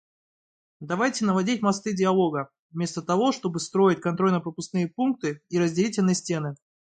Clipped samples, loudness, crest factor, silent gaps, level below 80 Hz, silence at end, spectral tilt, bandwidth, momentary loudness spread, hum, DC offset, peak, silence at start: under 0.1%; -25 LUFS; 16 dB; 2.59-2.70 s; -68 dBFS; 0.3 s; -5.5 dB/octave; 9.4 kHz; 8 LU; none; under 0.1%; -10 dBFS; 0.8 s